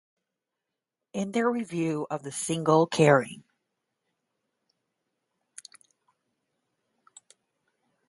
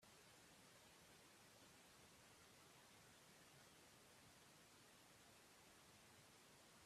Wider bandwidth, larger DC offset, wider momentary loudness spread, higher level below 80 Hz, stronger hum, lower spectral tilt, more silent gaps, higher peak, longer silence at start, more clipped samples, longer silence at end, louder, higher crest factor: second, 11.5 kHz vs 14.5 kHz; neither; first, 21 LU vs 1 LU; first, -74 dBFS vs -90 dBFS; neither; first, -5.5 dB/octave vs -2.5 dB/octave; neither; first, -4 dBFS vs -56 dBFS; first, 1.15 s vs 0 s; neither; first, 4.7 s vs 0 s; first, -26 LUFS vs -67 LUFS; first, 26 dB vs 14 dB